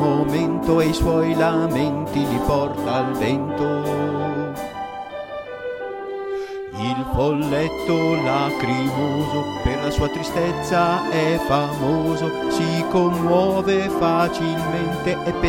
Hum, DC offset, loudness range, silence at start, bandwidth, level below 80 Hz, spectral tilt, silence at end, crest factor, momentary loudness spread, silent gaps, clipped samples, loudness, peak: none; under 0.1%; 6 LU; 0 s; 17 kHz; -38 dBFS; -6.5 dB/octave; 0 s; 16 dB; 11 LU; none; under 0.1%; -21 LUFS; -6 dBFS